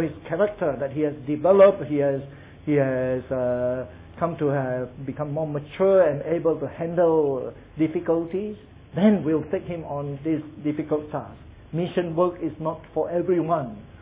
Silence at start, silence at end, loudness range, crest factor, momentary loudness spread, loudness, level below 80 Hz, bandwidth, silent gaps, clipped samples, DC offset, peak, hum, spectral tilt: 0 s; 0 s; 5 LU; 18 dB; 12 LU; -24 LUFS; -52 dBFS; 3.9 kHz; none; under 0.1%; under 0.1%; -6 dBFS; none; -11.5 dB/octave